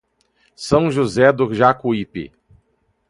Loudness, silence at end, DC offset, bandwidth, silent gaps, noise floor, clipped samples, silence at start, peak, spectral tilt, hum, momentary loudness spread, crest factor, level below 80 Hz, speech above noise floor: -17 LUFS; 0.8 s; under 0.1%; 11.5 kHz; none; -65 dBFS; under 0.1%; 0.6 s; 0 dBFS; -6.5 dB/octave; none; 17 LU; 18 dB; -48 dBFS; 48 dB